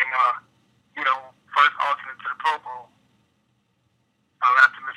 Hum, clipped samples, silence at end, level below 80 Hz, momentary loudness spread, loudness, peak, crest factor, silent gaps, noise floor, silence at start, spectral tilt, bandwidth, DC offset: none; under 0.1%; 0.05 s; -82 dBFS; 17 LU; -21 LUFS; -2 dBFS; 22 dB; none; -68 dBFS; 0 s; -0.5 dB/octave; 11.5 kHz; under 0.1%